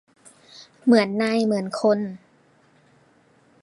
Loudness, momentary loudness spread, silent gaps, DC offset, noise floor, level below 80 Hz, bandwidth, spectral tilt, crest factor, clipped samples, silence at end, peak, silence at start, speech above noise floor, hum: -21 LUFS; 11 LU; none; under 0.1%; -58 dBFS; -70 dBFS; 11.5 kHz; -6 dB/octave; 20 dB; under 0.1%; 1.45 s; -4 dBFS; 0.6 s; 38 dB; none